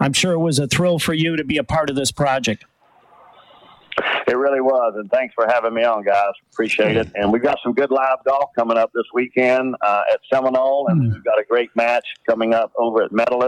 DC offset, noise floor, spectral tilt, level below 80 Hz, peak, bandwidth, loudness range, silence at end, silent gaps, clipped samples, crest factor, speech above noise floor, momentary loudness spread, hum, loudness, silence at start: under 0.1%; -53 dBFS; -5 dB/octave; -50 dBFS; -6 dBFS; 15.5 kHz; 3 LU; 0 s; none; under 0.1%; 12 dB; 35 dB; 4 LU; none; -18 LUFS; 0 s